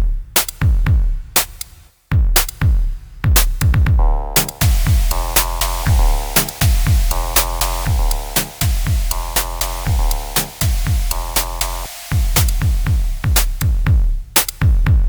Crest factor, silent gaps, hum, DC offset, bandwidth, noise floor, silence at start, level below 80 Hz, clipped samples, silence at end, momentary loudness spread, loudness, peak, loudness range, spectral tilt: 16 dB; none; none; under 0.1%; over 20 kHz; -35 dBFS; 0 s; -18 dBFS; under 0.1%; 0 s; 5 LU; -17 LUFS; 0 dBFS; 3 LU; -3.5 dB/octave